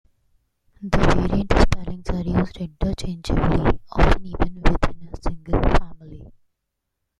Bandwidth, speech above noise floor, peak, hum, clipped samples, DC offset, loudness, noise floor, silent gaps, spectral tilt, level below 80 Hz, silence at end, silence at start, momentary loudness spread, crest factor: 10 kHz; 60 dB; 0 dBFS; none; under 0.1%; under 0.1%; -23 LUFS; -79 dBFS; none; -7 dB/octave; -26 dBFS; 0.9 s; 0.8 s; 12 LU; 20 dB